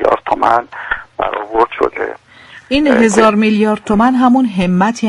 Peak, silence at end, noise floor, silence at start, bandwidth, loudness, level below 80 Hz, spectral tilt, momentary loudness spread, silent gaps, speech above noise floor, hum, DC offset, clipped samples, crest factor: 0 dBFS; 0 s; -39 dBFS; 0 s; 11.5 kHz; -13 LUFS; -40 dBFS; -5.5 dB/octave; 11 LU; none; 28 dB; none; under 0.1%; under 0.1%; 12 dB